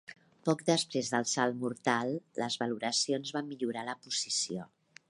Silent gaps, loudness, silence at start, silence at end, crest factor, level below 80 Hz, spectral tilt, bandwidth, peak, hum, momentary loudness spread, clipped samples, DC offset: none; -33 LUFS; 0.1 s; 0.45 s; 22 dB; -80 dBFS; -3 dB/octave; 11.5 kHz; -12 dBFS; none; 8 LU; under 0.1%; under 0.1%